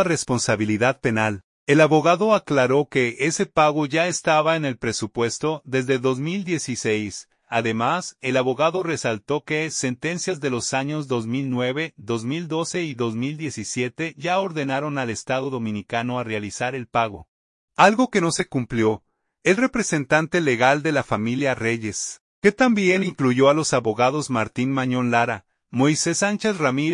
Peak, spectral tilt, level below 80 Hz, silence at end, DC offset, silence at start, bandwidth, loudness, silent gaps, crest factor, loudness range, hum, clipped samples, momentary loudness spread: 0 dBFS; -4.5 dB/octave; -58 dBFS; 0 s; under 0.1%; 0 s; 11 kHz; -22 LUFS; 1.44-1.67 s, 17.28-17.68 s, 22.20-22.42 s; 22 dB; 6 LU; none; under 0.1%; 9 LU